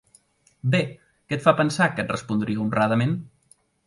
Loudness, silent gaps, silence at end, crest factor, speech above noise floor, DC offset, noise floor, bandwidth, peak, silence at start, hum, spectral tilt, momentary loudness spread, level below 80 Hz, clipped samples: -23 LUFS; none; 0.6 s; 22 dB; 38 dB; under 0.1%; -61 dBFS; 11.5 kHz; -4 dBFS; 0.65 s; none; -6.5 dB/octave; 11 LU; -58 dBFS; under 0.1%